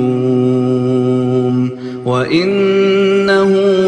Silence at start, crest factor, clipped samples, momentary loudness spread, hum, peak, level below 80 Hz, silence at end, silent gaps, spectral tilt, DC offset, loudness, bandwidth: 0 s; 12 dB; under 0.1%; 6 LU; none; 0 dBFS; -54 dBFS; 0 s; none; -7.5 dB/octave; under 0.1%; -13 LUFS; 9.4 kHz